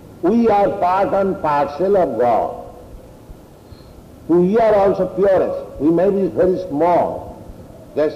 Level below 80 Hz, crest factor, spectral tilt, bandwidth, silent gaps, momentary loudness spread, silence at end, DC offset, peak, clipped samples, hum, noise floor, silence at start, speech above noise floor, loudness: -44 dBFS; 10 dB; -8.5 dB/octave; 14 kHz; none; 13 LU; 0 s; under 0.1%; -6 dBFS; under 0.1%; none; -41 dBFS; 0 s; 25 dB; -17 LUFS